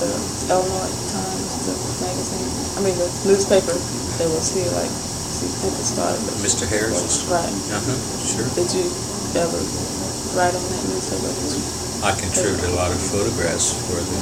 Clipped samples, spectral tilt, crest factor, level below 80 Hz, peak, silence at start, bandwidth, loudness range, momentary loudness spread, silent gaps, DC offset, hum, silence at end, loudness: under 0.1%; -3.5 dB/octave; 18 dB; -42 dBFS; -4 dBFS; 0 s; 16.5 kHz; 2 LU; 5 LU; none; under 0.1%; none; 0 s; -21 LUFS